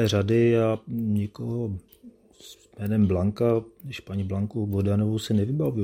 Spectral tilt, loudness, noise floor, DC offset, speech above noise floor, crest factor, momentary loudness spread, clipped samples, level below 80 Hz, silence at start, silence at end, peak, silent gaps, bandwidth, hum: -7.5 dB/octave; -25 LUFS; -50 dBFS; under 0.1%; 26 dB; 14 dB; 12 LU; under 0.1%; -54 dBFS; 0 s; 0 s; -10 dBFS; none; 16.5 kHz; none